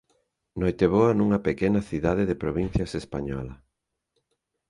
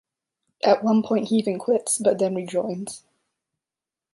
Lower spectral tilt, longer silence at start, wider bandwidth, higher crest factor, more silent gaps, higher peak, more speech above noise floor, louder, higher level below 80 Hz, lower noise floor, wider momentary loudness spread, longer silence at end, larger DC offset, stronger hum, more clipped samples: first, -8 dB/octave vs -5 dB/octave; about the same, 0.55 s vs 0.65 s; about the same, 11 kHz vs 11.5 kHz; about the same, 20 dB vs 18 dB; neither; about the same, -6 dBFS vs -6 dBFS; second, 57 dB vs 68 dB; about the same, -25 LUFS vs -23 LUFS; first, -44 dBFS vs -72 dBFS; second, -81 dBFS vs -90 dBFS; about the same, 12 LU vs 11 LU; about the same, 1.15 s vs 1.15 s; neither; neither; neither